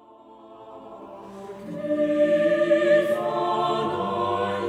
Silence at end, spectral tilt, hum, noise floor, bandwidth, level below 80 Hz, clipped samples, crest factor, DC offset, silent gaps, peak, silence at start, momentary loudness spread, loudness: 0 s; -6 dB/octave; none; -48 dBFS; 12.5 kHz; -66 dBFS; under 0.1%; 16 dB; under 0.1%; none; -8 dBFS; 0.3 s; 22 LU; -23 LUFS